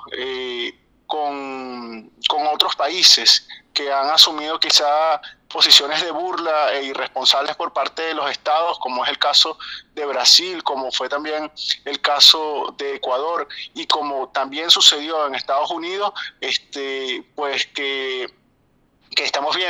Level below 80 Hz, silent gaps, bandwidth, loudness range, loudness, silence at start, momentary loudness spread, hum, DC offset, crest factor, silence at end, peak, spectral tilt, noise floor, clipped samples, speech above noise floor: -64 dBFS; none; over 20 kHz; 8 LU; -17 LUFS; 0 s; 16 LU; none; under 0.1%; 20 dB; 0 s; 0 dBFS; 0.5 dB/octave; -60 dBFS; under 0.1%; 41 dB